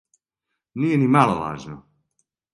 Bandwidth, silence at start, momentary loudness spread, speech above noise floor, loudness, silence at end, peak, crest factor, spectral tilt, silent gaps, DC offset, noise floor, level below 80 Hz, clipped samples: 11.5 kHz; 0.75 s; 22 LU; 61 dB; -20 LUFS; 0.75 s; -2 dBFS; 22 dB; -7.5 dB/octave; none; under 0.1%; -81 dBFS; -56 dBFS; under 0.1%